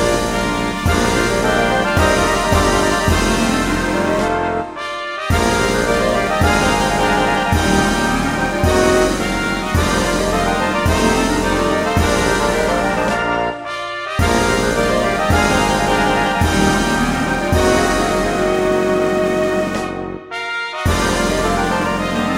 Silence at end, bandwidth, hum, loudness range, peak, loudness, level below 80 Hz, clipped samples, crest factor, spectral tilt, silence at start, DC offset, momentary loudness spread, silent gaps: 0 s; 16 kHz; none; 2 LU; 0 dBFS; -16 LUFS; -28 dBFS; under 0.1%; 16 dB; -4.5 dB/octave; 0 s; under 0.1%; 5 LU; none